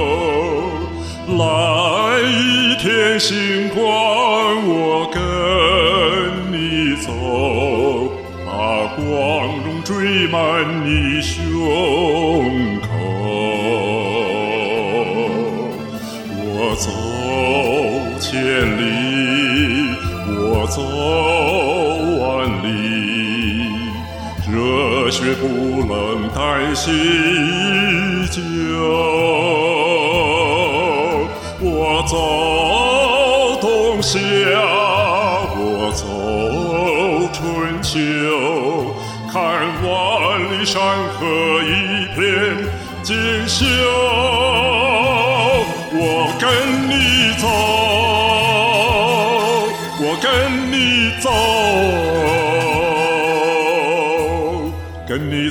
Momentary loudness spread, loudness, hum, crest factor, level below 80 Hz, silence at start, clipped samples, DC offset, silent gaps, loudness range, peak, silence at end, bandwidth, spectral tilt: 7 LU; -16 LUFS; none; 14 dB; -38 dBFS; 0 s; under 0.1%; under 0.1%; none; 4 LU; -2 dBFS; 0 s; 17.5 kHz; -4.5 dB/octave